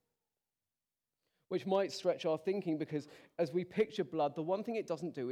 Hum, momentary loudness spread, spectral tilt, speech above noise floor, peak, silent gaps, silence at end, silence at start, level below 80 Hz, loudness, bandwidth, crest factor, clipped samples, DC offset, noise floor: none; 6 LU; -6.5 dB/octave; over 54 dB; -20 dBFS; none; 0 s; 1.5 s; -84 dBFS; -37 LUFS; 13.5 kHz; 18 dB; under 0.1%; under 0.1%; under -90 dBFS